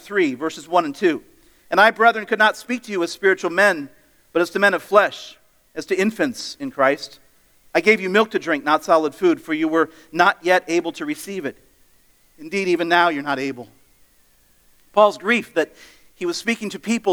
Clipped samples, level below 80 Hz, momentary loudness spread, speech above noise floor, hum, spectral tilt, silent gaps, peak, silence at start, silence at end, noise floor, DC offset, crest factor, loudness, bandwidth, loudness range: under 0.1%; -64 dBFS; 13 LU; 37 dB; none; -4 dB/octave; none; 0 dBFS; 0.05 s; 0 s; -56 dBFS; under 0.1%; 20 dB; -19 LUFS; over 20 kHz; 5 LU